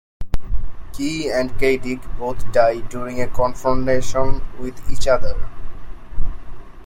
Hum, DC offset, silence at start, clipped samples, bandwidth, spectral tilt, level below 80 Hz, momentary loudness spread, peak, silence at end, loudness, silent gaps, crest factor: none; under 0.1%; 0.2 s; under 0.1%; 9.8 kHz; -5.5 dB/octave; -26 dBFS; 17 LU; -2 dBFS; 0 s; -22 LUFS; none; 14 dB